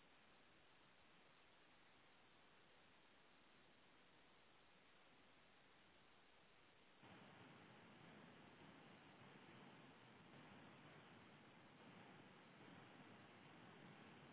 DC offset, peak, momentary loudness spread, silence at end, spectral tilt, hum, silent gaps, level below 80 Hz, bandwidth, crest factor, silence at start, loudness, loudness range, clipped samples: under 0.1%; -52 dBFS; 2 LU; 0 s; -3.5 dB/octave; none; none; under -90 dBFS; 4 kHz; 16 dB; 0 s; -65 LUFS; 3 LU; under 0.1%